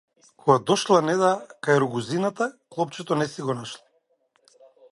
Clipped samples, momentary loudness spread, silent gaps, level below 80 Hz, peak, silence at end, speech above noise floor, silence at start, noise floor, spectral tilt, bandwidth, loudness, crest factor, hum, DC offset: under 0.1%; 10 LU; none; -70 dBFS; -4 dBFS; 1.15 s; 45 dB; 0.45 s; -68 dBFS; -5 dB/octave; 11.5 kHz; -24 LUFS; 22 dB; none; under 0.1%